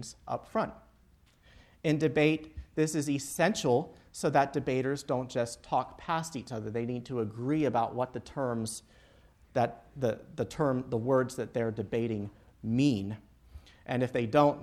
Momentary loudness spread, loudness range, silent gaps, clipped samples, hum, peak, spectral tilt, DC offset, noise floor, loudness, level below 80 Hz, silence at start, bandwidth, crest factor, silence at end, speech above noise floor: 11 LU; 4 LU; none; under 0.1%; none; -10 dBFS; -6 dB/octave; under 0.1%; -63 dBFS; -31 LUFS; -58 dBFS; 0 s; 14.5 kHz; 22 dB; 0 s; 32 dB